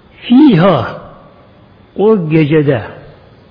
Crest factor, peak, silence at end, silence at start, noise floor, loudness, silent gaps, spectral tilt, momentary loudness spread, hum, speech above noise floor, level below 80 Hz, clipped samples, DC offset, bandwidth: 12 dB; 0 dBFS; 0.5 s; 0.25 s; -42 dBFS; -10 LUFS; none; -10 dB/octave; 21 LU; none; 33 dB; -46 dBFS; under 0.1%; under 0.1%; 5.2 kHz